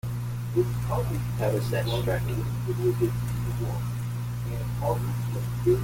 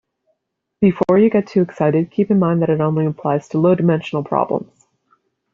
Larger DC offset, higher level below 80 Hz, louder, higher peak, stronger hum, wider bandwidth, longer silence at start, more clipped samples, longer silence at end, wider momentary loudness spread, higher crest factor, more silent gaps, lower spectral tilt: neither; first, -40 dBFS vs -58 dBFS; second, -28 LUFS vs -17 LUFS; second, -10 dBFS vs -2 dBFS; first, 60 Hz at -30 dBFS vs none; first, 17 kHz vs 7.4 kHz; second, 0.05 s vs 0.8 s; neither; second, 0 s vs 0.9 s; about the same, 6 LU vs 6 LU; about the same, 16 dB vs 14 dB; neither; second, -7 dB/octave vs -8.5 dB/octave